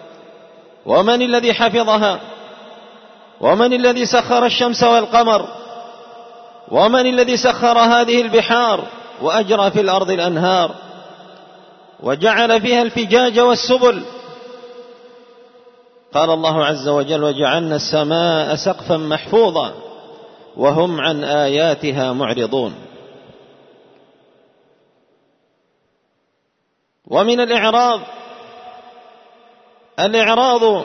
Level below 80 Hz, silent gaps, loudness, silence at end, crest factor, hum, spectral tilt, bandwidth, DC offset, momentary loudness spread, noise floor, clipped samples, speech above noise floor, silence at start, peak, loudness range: -58 dBFS; none; -15 LUFS; 0 s; 16 dB; none; -4.5 dB/octave; 6.6 kHz; under 0.1%; 20 LU; -68 dBFS; under 0.1%; 53 dB; 0 s; -2 dBFS; 6 LU